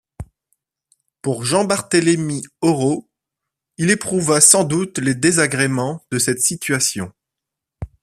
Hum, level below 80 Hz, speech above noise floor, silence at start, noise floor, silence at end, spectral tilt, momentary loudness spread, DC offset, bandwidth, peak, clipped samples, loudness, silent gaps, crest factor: none; -50 dBFS; 66 dB; 0.2 s; -83 dBFS; 0.15 s; -3.5 dB/octave; 14 LU; under 0.1%; 15 kHz; 0 dBFS; under 0.1%; -17 LUFS; none; 20 dB